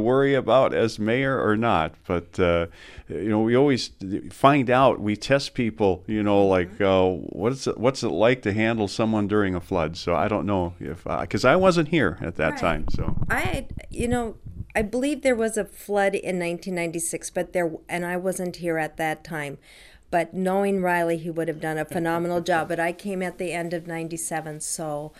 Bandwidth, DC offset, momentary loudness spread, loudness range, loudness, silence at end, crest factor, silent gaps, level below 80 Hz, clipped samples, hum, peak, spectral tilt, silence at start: 15.5 kHz; under 0.1%; 10 LU; 5 LU; -24 LUFS; 0.1 s; 20 dB; none; -42 dBFS; under 0.1%; none; -4 dBFS; -5.5 dB/octave; 0 s